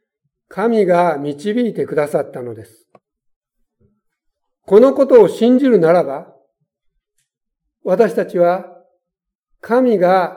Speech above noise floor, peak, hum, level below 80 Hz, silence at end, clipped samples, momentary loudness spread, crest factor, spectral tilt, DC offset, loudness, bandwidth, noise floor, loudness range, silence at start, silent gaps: 67 dB; 0 dBFS; none; -68 dBFS; 0 s; under 0.1%; 17 LU; 16 dB; -7.5 dB/octave; under 0.1%; -14 LUFS; 14.5 kHz; -81 dBFS; 7 LU; 0.55 s; 3.36-3.41 s